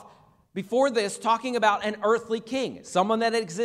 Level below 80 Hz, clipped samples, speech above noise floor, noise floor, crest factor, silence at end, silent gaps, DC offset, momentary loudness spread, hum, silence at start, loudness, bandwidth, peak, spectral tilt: -70 dBFS; under 0.1%; 30 dB; -55 dBFS; 18 dB; 0 s; none; under 0.1%; 7 LU; none; 0 s; -25 LUFS; 13.5 kHz; -8 dBFS; -4 dB/octave